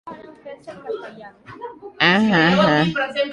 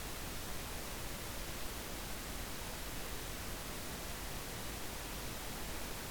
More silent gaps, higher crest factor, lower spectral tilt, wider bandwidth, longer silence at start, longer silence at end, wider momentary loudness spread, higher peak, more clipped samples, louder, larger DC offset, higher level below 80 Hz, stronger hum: neither; first, 20 dB vs 14 dB; first, -6 dB/octave vs -3 dB/octave; second, 10.5 kHz vs over 20 kHz; about the same, 0.05 s vs 0 s; about the same, 0 s vs 0 s; first, 23 LU vs 0 LU; first, -2 dBFS vs -30 dBFS; neither; first, -16 LUFS vs -43 LUFS; neither; about the same, -54 dBFS vs -50 dBFS; neither